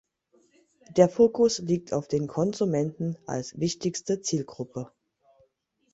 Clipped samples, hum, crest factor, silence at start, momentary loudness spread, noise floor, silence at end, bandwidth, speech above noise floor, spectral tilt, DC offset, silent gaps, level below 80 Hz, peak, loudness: under 0.1%; none; 22 dB; 0.9 s; 15 LU; -71 dBFS; 1.05 s; 8 kHz; 45 dB; -6 dB/octave; under 0.1%; none; -64 dBFS; -4 dBFS; -27 LUFS